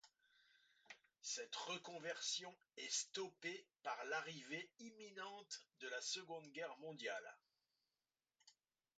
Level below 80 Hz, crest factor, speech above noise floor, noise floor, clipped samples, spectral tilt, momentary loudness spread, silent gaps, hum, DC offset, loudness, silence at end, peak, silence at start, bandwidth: under -90 dBFS; 22 dB; over 40 dB; under -90 dBFS; under 0.1%; -1 dB/octave; 13 LU; none; none; under 0.1%; -49 LUFS; 0.5 s; -30 dBFS; 0.05 s; 9 kHz